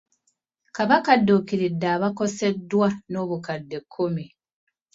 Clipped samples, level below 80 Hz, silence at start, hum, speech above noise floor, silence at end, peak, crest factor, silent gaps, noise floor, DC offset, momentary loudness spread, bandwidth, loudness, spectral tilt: under 0.1%; -64 dBFS; 0.75 s; none; 50 dB; 0.7 s; -2 dBFS; 22 dB; none; -73 dBFS; under 0.1%; 14 LU; 7.8 kHz; -23 LUFS; -6 dB/octave